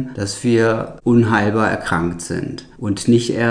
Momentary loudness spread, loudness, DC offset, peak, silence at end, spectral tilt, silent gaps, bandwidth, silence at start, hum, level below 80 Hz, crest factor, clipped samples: 10 LU; -18 LUFS; under 0.1%; -2 dBFS; 0 s; -6 dB/octave; none; 10 kHz; 0 s; none; -44 dBFS; 16 dB; under 0.1%